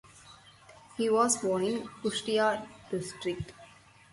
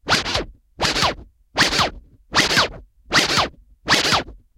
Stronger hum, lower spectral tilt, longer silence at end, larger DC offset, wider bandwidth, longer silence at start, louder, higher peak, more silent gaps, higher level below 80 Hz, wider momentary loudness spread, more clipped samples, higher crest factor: neither; first, -3.5 dB/octave vs -2 dB/octave; first, 0.45 s vs 0.2 s; neither; second, 11.5 kHz vs 17 kHz; about the same, 0.15 s vs 0.05 s; second, -30 LUFS vs -19 LUFS; second, -12 dBFS vs 0 dBFS; neither; second, -64 dBFS vs -40 dBFS; about the same, 12 LU vs 10 LU; neither; about the same, 20 dB vs 20 dB